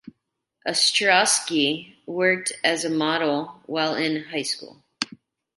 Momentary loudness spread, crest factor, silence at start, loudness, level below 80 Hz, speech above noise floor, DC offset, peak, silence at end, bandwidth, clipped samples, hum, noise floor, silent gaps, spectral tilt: 14 LU; 20 dB; 0.05 s; -22 LUFS; -72 dBFS; 55 dB; under 0.1%; -4 dBFS; 0.5 s; 12 kHz; under 0.1%; none; -78 dBFS; none; -2 dB/octave